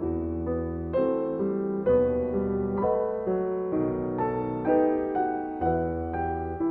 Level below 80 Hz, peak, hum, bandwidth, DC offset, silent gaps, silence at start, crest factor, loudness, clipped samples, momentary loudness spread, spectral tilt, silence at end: -46 dBFS; -12 dBFS; none; 3.8 kHz; under 0.1%; none; 0 s; 14 dB; -27 LUFS; under 0.1%; 6 LU; -12 dB/octave; 0 s